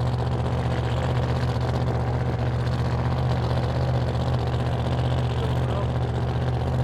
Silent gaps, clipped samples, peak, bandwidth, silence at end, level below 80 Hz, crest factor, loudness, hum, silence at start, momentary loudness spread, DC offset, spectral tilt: none; under 0.1%; -10 dBFS; 9.2 kHz; 0 s; -32 dBFS; 14 dB; -25 LUFS; none; 0 s; 1 LU; under 0.1%; -7.5 dB/octave